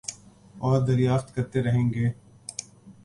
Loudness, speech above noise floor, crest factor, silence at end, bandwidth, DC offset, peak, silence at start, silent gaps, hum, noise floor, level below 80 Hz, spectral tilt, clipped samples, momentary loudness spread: -25 LUFS; 26 dB; 16 dB; 0.1 s; 11.5 kHz; under 0.1%; -10 dBFS; 0.1 s; none; none; -49 dBFS; -52 dBFS; -7 dB/octave; under 0.1%; 15 LU